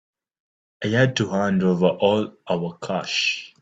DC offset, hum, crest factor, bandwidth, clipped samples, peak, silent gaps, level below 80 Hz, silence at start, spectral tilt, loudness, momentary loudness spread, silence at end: under 0.1%; none; 18 dB; 8 kHz; under 0.1%; -4 dBFS; none; -62 dBFS; 0.8 s; -5.5 dB/octave; -22 LUFS; 8 LU; 0.15 s